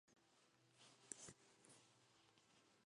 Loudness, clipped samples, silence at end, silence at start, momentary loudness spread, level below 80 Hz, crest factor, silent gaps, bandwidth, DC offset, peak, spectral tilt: -61 LUFS; under 0.1%; 0 s; 0.05 s; 12 LU; under -90 dBFS; 36 dB; none; 11 kHz; under 0.1%; -32 dBFS; -1.5 dB/octave